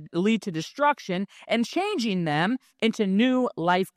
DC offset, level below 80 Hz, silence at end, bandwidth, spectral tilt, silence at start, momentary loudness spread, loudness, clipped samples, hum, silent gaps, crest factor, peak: under 0.1%; -72 dBFS; 0.05 s; 14.5 kHz; -5.5 dB/octave; 0 s; 6 LU; -25 LUFS; under 0.1%; none; none; 16 dB; -8 dBFS